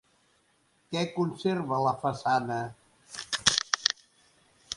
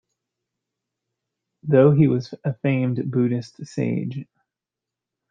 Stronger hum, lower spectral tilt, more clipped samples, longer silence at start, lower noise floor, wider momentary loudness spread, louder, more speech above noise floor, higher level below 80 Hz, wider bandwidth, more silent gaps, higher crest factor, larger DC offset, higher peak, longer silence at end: neither; second, -3 dB/octave vs -9 dB/octave; neither; second, 0.9 s vs 1.65 s; second, -68 dBFS vs -87 dBFS; second, 13 LU vs 16 LU; second, -28 LUFS vs -21 LUFS; second, 40 dB vs 67 dB; about the same, -64 dBFS vs -64 dBFS; first, 11.5 kHz vs 7.4 kHz; neither; first, 30 dB vs 20 dB; neither; about the same, -2 dBFS vs -4 dBFS; second, 0 s vs 1.05 s